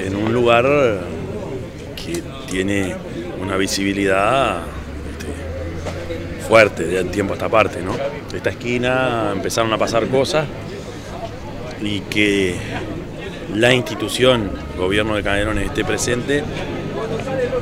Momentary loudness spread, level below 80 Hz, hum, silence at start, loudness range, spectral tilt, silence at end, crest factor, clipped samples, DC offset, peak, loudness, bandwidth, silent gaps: 14 LU; -36 dBFS; none; 0 s; 3 LU; -5 dB/octave; 0 s; 20 dB; under 0.1%; under 0.1%; 0 dBFS; -19 LUFS; 16 kHz; none